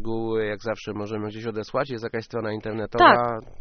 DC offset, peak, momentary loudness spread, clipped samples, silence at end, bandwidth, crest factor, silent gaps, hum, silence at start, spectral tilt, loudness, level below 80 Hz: under 0.1%; -2 dBFS; 15 LU; under 0.1%; 0.05 s; 6.6 kHz; 22 dB; none; none; 0 s; -3.5 dB/octave; -24 LUFS; -48 dBFS